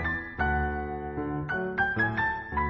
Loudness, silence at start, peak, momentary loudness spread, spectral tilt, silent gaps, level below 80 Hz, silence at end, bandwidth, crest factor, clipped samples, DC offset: -29 LUFS; 0 s; -14 dBFS; 8 LU; -8.5 dB/octave; none; -40 dBFS; 0 s; 5.8 kHz; 16 dB; under 0.1%; under 0.1%